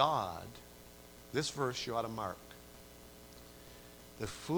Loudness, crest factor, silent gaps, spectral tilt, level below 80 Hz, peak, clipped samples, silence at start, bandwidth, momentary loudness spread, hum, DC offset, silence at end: -38 LUFS; 26 dB; none; -4.5 dB/octave; -62 dBFS; -14 dBFS; under 0.1%; 0 s; over 20 kHz; 19 LU; 60 Hz at -60 dBFS; under 0.1%; 0 s